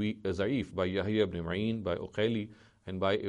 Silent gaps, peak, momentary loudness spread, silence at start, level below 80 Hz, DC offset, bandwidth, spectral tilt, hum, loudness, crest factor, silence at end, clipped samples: none; -14 dBFS; 8 LU; 0 s; -58 dBFS; under 0.1%; 10 kHz; -7 dB/octave; none; -33 LUFS; 18 dB; 0 s; under 0.1%